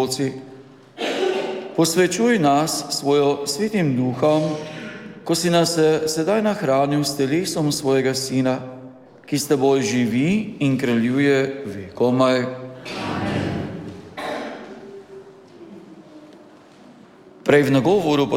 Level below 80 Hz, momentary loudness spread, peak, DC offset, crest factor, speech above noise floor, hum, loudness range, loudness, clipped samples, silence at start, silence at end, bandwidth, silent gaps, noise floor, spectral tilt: -58 dBFS; 15 LU; -4 dBFS; under 0.1%; 16 dB; 27 dB; none; 10 LU; -20 LUFS; under 0.1%; 0 s; 0 s; 16.5 kHz; none; -46 dBFS; -5 dB/octave